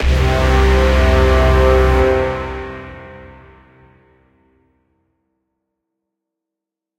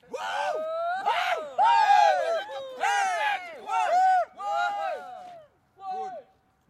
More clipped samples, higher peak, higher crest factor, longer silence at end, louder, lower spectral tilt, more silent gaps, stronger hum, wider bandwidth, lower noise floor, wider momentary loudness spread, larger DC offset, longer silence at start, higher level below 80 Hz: neither; first, -2 dBFS vs -10 dBFS; about the same, 16 dB vs 16 dB; first, 3.7 s vs 0.5 s; first, -14 LUFS vs -25 LUFS; first, -6.5 dB/octave vs 0 dB/octave; neither; neither; second, 10.5 kHz vs 13.5 kHz; first, -84 dBFS vs -56 dBFS; first, 20 LU vs 17 LU; neither; about the same, 0 s vs 0.1 s; first, -20 dBFS vs -78 dBFS